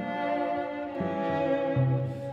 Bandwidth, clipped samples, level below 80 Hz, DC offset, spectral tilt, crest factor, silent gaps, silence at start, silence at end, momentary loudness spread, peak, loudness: 5.6 kHz; under 0.1%; -62 dBFS; under 0.1%; -9 dB/octave; 14 dB; none; 0 s; 0 s; 6 LU; -16 dBFS; -29 LUFS